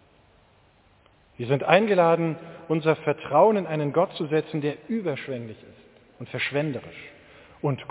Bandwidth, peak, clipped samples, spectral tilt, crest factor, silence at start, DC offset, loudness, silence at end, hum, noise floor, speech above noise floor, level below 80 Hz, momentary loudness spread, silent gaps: 4 kHz; -2 dBFS; under 0.1%; -10.5 dB/octave; 24 dB; 1.4 s; under 0.1%; -24 LUFS; 0.05 s; none; -59 dBFS; 35 dB; -66 dBFS; 17 LU; none